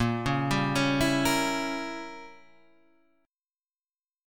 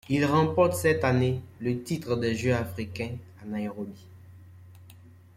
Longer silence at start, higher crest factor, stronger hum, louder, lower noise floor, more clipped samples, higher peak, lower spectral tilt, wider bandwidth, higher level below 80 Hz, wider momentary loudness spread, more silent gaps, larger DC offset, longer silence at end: about the same, 0 s vs 0.1 s; about the same, 18 dB vs 18 dB; neither; about the same, -27 LUFS vs -27 LUFS; first, under -90 dBFS vs -51 dBFS; neither; about the same, -12 dBFS vs -10 dBFS; second, -4.5 dB/octave vs -6.5 dB/octave; first, 18 kHz vs 16 kHz; first, -50 dBFS vs -58 dBFS; about the same, 14 LU vs 13 LU; neither; neither; first, 1.9 s vs 0.25 s